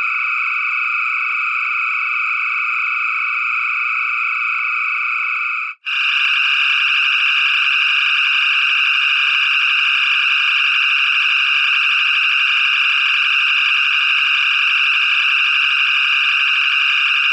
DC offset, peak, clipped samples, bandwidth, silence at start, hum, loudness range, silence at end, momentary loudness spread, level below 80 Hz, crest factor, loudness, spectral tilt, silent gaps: under 0.1%; -4 dBFS; under 0.1%; 9.2 kHz; 0 s; none; 4 LU; 0 s; 4 LU; under -90 dBFS; 12 dB; -13 LUFS; 10.5 dB/octave; none